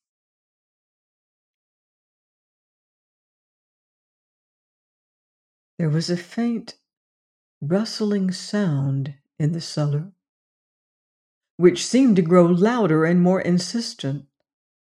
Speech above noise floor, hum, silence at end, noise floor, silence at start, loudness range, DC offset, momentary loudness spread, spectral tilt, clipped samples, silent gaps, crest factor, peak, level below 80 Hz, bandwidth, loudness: over 70 dB; none; 0.75 s; under -90 dBFS; 5.8 s; 10 LU; under 0.1%; 12 LU; -6.5 dB/octave; under 0.1%; 6.97-7.61 s, 10.29-11.41 s, 11.50-11.58 s; 20 dB; -4 dBFS; -70 dBFS; 10.5 kHz; -21 LUFS